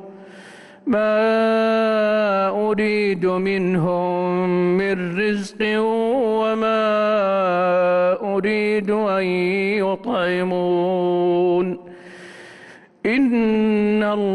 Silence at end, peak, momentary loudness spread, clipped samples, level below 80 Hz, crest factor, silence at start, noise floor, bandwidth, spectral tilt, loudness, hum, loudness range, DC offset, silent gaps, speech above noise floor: 0 s; -10 dBFS; 4 LU; under 0.1%; -58 dBFS; 10 dB; 0 s; -45 dBFS; 11.5 kHz; -7 dB/octave; -19 LUFS; none; 2 LU; under 0.1%; none; 26 dB